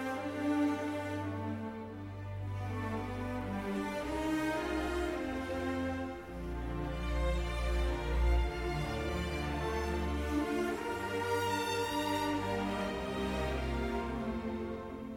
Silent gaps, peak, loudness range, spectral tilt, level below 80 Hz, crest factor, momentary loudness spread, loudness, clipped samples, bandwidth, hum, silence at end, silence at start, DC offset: none; -20 dBFS; 3 LU; -6 dB/octave; -40 dBFS; 14 dB; 7 LU; -36 LUFS; under 0.1%; 16 kHz; none; 0 s; 0 s; under 0.1%